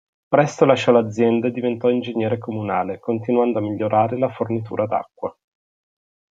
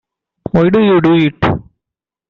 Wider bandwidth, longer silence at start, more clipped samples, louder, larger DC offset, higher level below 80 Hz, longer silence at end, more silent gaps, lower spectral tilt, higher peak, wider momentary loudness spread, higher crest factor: first, 7.8 kHz vs 6.2 kHz; second, 0.3 s vs 0.55 s; neither; second, -20 LUFS vs -12 LUFS; neither; second, -64 dBFS vs -40 dBFS; first, 1.05 s vs 0.7 s; neither; second, -7 dB/octave vs -9 dB/octave; about the same, -2 dBFS vs -2 dBFS; about the same, 9 LU vs 11 LU; first, 18 dB vs 12 dB